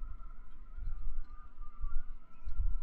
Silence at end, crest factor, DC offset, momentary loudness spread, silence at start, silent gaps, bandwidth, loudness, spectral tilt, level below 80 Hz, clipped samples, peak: 0 s; 12 dB; under 0.1%; 12 LU; 0 s; none; 1.6 kHz; -48 LUFS; -8 dB/octave; -36 dBFS; under 0.1%; -18 dBFS